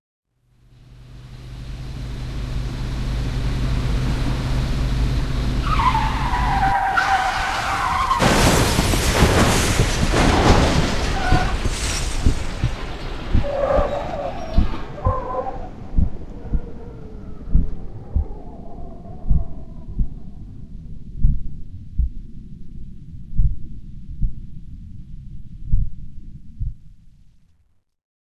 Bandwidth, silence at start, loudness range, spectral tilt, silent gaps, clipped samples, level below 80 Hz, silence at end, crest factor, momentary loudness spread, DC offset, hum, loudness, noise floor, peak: 13.5 kHz; 0.9 s; 15 LU; -5 dB/octave; none; under 0.1%; -26 dBFS; 1.15 s; 20 dB; 23 LU; under 0.1%; none; -21 LUFS; -60 dBFS; 0 dBFS